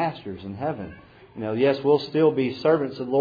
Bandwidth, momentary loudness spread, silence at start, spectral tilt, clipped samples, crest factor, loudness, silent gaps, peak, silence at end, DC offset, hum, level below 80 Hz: 5 kHz; 15 LU; 0 s; -8.5 dB/octave; under 0.1%; 16 dB; -23 LUFS; none; -8 dBFS; 0 s; under 0.1%; none; -60 dBFS